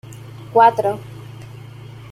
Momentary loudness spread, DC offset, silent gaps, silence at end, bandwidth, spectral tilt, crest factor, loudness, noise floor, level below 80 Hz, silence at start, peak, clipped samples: 24 LU; under 0.1%; none; 0.15 s; 14 kHz; -6 dB/octave; 18 dB; -16 LUFS; -37 dBFS; -56 dBFS; 0.1 s; -2 dBFS; under 0.1%